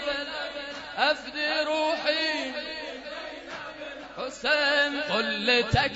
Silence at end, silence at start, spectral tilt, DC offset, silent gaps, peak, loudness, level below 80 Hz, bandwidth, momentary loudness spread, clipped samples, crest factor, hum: 0 s; 0 s; -4 dB/octave; under 0.1%; none; -8 dBFS; -26 LUFS; -52 dBFS; 8 kHz; 15 LU; under 0.1%; 20 dB; none